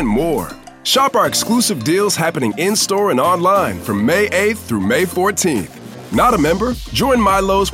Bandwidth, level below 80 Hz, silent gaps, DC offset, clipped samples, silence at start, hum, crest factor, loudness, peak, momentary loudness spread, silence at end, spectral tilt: 16.5 kHz; -36 dBFS; none; under 0.1%; under 0.1%; 0 s; none; 12 dB; -15 LUFS; -2 dBFS; 6 LU; 0 s; -4 dB/octave